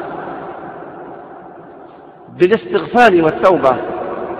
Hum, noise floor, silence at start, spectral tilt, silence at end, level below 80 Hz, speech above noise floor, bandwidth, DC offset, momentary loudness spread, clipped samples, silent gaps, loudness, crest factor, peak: none; -38 dBFS; 0 s; -6.5 dB/octave; 0 s; -52 dBFS; 26 dB; 9.8 kHz; under 0.1%; 23 LU; under 0.1%; none; -13 LUFS; 16 dB; 0 dBFS